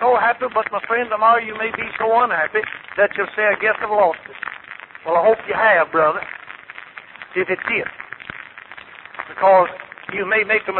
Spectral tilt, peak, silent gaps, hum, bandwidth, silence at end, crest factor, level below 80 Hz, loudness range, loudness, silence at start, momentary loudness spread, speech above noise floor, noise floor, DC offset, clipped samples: -8 dB/octave; -4 dBFS; none; none; 4.2 kHz; 0 s; 16 dB; -60 dBFS; 4 LU; -18 LUFS; 0 s; 21 LU; 21 dB; -39 dBFS; under 0.1%; under 0.1%